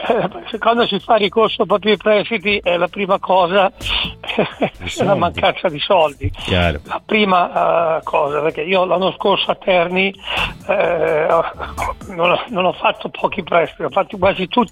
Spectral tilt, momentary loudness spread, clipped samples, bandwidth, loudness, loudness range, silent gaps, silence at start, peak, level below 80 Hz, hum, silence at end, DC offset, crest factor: -5.5 dB/octave; 6 LU; under 0.1%; 15 kHz; -17 LUFS; 2 LU; none; 0 s; -2 dBFS; -40 dBFS; none; 0 s; under 0.1%; 14 dB